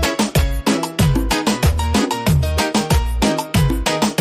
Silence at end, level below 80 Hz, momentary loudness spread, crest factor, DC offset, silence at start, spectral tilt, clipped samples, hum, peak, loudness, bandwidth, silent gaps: 0 s; -22 dBFS; 2 LU; 12 dB; under 0.1%; 0 s; -5 dB/octave; under 0.1%; none; -4 dBFS; -17 LUFS; 15.5 kHz; none